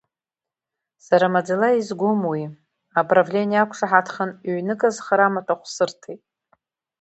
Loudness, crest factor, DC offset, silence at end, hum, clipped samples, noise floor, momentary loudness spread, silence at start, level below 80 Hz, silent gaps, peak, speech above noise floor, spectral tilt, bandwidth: -21 LUFS; 22 dB; under 0.1%; 0.85 s; none; under 0.1%; -89 dBFS; 10 LU; 1.1 s; -72 dBFS; none; 0 dBFS; 69 dB; -5.5 dB/octave; 8.2 kHz